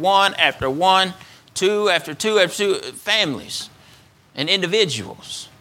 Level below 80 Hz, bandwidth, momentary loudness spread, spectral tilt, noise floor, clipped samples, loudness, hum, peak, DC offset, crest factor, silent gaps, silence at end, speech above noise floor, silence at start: -56 dBFS; 16.5 kHz; 15 LU; -2.5 dB/octave; -50 dBFS; under 0.1%; -19 LUFS; none; 0 dBFS; under 0.1%; 20 dB; none; 0.15 s; 31 dB; 0 s